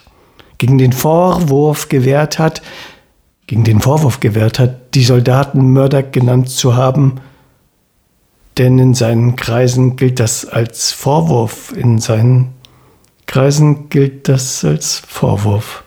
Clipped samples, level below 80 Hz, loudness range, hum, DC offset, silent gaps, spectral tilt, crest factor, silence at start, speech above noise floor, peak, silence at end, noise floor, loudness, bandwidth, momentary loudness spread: under 0.1%; -42 dBFS; 2 LU; none; under 0.1%; none; -6 dB/octave; 12 dB; 0.6 s; 46 dB; 0 dBFS; 0.05 s; -57 dBFS; -12 LUFS; 17.5 kHz; 7 LU